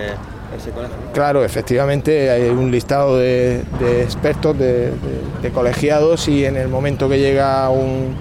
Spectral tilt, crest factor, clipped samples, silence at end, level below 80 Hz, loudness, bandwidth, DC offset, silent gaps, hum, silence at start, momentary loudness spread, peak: -6.5 dB/octave; 10 dB; under 0.1%; 0 s; -34 dBFS; -16 LUFS; 15.5 kHz; 0.1%; none; none; 0 s; 10 LU; -6 dBFS